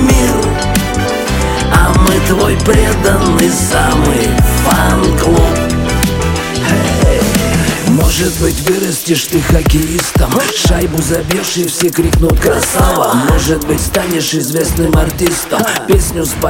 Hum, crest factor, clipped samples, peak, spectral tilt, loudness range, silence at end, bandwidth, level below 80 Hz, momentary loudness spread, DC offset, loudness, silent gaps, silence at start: none; 10 dB; under 0.1%; 0 dBFS; -4.5 dB/octave; 2 LU; 0 s; 17 kHz; -18 dBFS; 4 LU; under 0.1%; -11 LUFS; none; 0 s